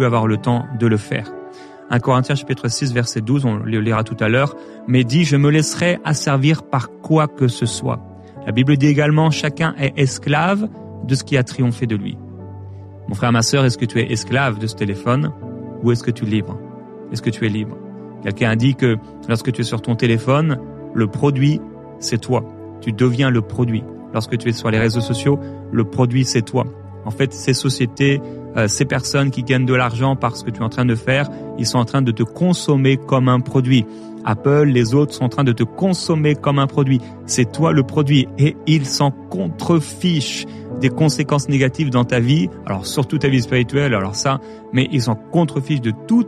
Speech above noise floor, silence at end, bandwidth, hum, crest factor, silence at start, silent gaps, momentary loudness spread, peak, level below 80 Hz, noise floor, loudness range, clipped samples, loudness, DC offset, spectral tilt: 20 dB; 0 s; 13 kHz; none; 16 dB; 0 s; none; 10 LU; -2 dBFS; -50 dBFS; -37 dBFS; 4 LU; under 0.1%; -18 LUFS; under 0.1%; -6 dB/octave